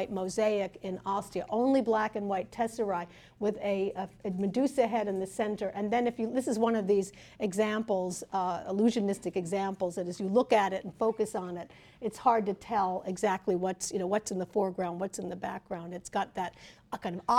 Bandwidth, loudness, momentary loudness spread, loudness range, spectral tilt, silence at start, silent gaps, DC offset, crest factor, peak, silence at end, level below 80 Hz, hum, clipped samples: 16 kHz; -31 LUFS; 10 LU; 3 LU; -5.5 dB/octave; 0 s; none; under 0.1%; 20 dB; -10 dBFS; 0 s; -66 dBFS; none; under 0.1%